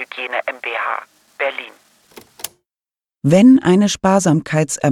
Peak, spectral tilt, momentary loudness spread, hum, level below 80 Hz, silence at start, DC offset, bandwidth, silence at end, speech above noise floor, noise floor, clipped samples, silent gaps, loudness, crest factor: -2 dBFS; -5.5 dB/octave; 21 LU; none; -54 dBFS; 0 s; under 0.1%; 17.5 kHz; 0 s; over 77 dB; under -90 dBFS; under 0.1%; none; -15 LUFS; 16 dB